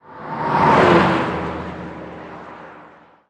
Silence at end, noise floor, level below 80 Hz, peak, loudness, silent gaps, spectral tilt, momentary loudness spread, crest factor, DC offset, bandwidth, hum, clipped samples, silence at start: 0.5 s; -46 dBFS; -46 dBFS; -2 dBFS; -16 LUFS; none; -7 dB/octave; 23 LU; 18 dB; under 0.1%; 10 kHz; none; under 0.1%; 0.1 s